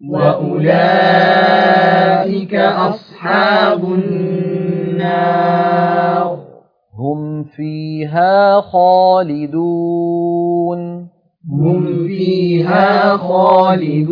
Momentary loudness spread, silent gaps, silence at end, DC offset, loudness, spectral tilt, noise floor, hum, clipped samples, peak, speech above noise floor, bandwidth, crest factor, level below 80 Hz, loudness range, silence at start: 12 LU; none; 0 s; under 0.1%; -13 LUFS; -9 dB/octave; -43 dBFS; none; under 0.1%; 0 dBFS; 31 dB; 5.2 kHz; 14 dB; -58 dBFS; 5 LU; 0 s